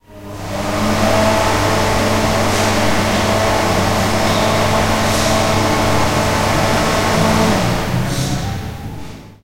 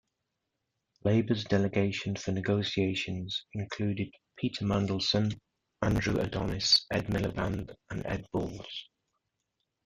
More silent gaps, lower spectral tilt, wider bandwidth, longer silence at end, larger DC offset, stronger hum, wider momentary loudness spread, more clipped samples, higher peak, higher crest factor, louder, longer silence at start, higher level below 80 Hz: neither; about the same, -4.5 dB/octave vs -5 dB/octave; first, 16 kHz vs 12.5 kHz; second, 0 s vs 1 s; first, 3% vs under 0.1%; neither; about the same, 10 LU vs 11 LU; neither; first, -2 dBFS vs -10 dBFS; second, 14 dB vs 20 dB; first, -15 LUFS vs -31 LUFS; second, 0 s vs 1.05 s; first, -30 dBFS vs -52 dBFS